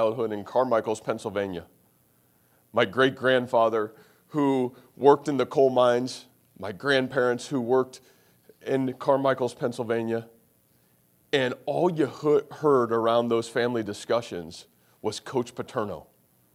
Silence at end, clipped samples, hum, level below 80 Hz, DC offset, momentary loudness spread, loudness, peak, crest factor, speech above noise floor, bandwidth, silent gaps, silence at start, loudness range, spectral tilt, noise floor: 0.55 s; under 0.1%; none; -70 dBFS; under 0.1%; 13 LU; -26 LUFS; -4 dBFS; 22 dB; 39 dB; 15 kHz; none; 0 s; 4 LU; -5.5 dB/octave; -64 dBFS